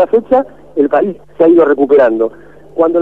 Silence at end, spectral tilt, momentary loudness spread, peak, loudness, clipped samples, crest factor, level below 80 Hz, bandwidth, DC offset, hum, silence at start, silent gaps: 0 s; -8.5 dB/octave; 11 LU; 0 dBFS; -11 LUFS; under 0.1%; 10 dB; -50 dBFS; 4.2 kHz; 0.9%; none; 0 s; none